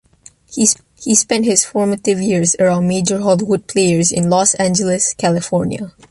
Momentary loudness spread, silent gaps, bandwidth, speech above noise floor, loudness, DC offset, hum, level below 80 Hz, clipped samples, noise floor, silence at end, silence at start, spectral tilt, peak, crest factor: 5 LU; none; 11.5 kHz; 31 dB; -14 LUFS; under 0.1%; none; -50 dBFS; under 0.1%; -46 dBFS; 0.2 s; 0.5 s; -4 dB/octave; 0 dBFS; 16 dB